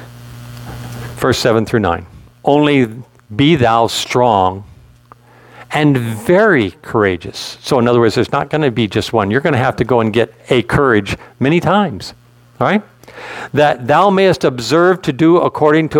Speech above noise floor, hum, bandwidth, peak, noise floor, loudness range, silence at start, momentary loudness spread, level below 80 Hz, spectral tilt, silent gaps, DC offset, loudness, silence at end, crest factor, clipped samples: 31 dB; none; 17.5 kHz; 0 dBFS; -44 dBFS; 2 LU; 0 s; 17 LU; -44 dBFS; -6 dB/octave; none; under 0.1%; -14 LUFS; 0 s; 14 dB; under 0.1%